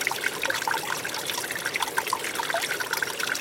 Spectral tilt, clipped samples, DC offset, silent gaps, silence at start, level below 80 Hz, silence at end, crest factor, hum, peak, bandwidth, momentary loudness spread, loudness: -0.5 dB/octave; under 0.1%; under 0.1%; none; 0 s; -68 dBFS; 0 s; 22 dB; none; -8 dBFS; 17 kHz; 2 LU; -27 LUFS